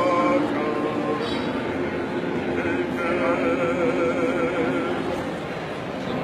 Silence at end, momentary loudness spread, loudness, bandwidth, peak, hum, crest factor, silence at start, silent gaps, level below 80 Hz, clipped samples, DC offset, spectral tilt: 0 s; 7 LU; -24 LUFS; 13 kHz; -10 dBFS; none; 14 dB; 0 s; none; -52 dBFS; under 0.1%; under 0.1%; -6.5 dB/octave